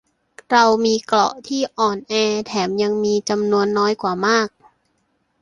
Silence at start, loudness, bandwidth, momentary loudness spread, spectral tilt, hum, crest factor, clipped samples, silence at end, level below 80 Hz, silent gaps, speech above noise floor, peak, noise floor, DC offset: 0.5 s; -18 LUFS; 11 kHz; 6 LU; -4 dB/octave; none; 18 dB; under 0.1%; 0.95 s; -60 dBFS; none; 49 dB; -2 dBFS; -67 dBFS; under 0.1%